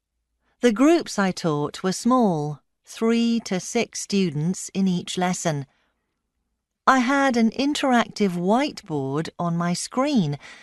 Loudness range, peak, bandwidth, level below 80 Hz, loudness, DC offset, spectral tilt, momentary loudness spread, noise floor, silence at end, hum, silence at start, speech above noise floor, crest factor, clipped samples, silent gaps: 3 LU; -2 dBFS; 12 kHz; -62 dBFS; -23 LUFS; under 0.1%; -5 dB/octave; 8 LU; -77 dBFS; 0.05 s; none; 0.65 s; 55 dB; 20 dB; under 0.1%; none